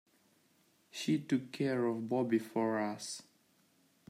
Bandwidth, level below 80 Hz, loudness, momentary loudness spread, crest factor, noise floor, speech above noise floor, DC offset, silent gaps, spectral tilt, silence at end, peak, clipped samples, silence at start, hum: 15.5 kHz; -84 dBFS; -35 LUFS; 10 LU; 18 dB; -71 dBFS; 37 dB; under 0.1%; none; -5.5 dB/octave; 0.9 s; -20 dBFS; under 0.1%; 0.95 s; none